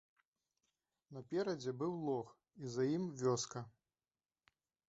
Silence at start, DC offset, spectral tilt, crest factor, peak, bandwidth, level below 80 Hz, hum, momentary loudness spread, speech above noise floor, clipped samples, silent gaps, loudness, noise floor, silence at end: 1.1 s; under 0.1%; -6 dB/octave; 20 dB; -24 dBFS; 8 kHz; -80 dBFS; none; 17 LU; over 50 dB; under 0.1%; none; -41 LUFS; under -90 dBFS; 1.2 s